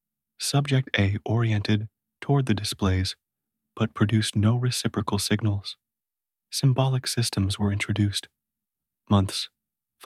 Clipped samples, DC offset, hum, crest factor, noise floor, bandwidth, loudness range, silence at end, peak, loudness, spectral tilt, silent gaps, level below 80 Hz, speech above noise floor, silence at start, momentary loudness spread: under 0.1%; under 0.1%; none; 18 dB; under -90 dBFS; 14.5 kHz; 1 LU; 0.6 s; -8 dBFS; -25 LUFS; -5 dB/octave; none; -54 dBFS; over 66 dB; 0.4 s; 9 LU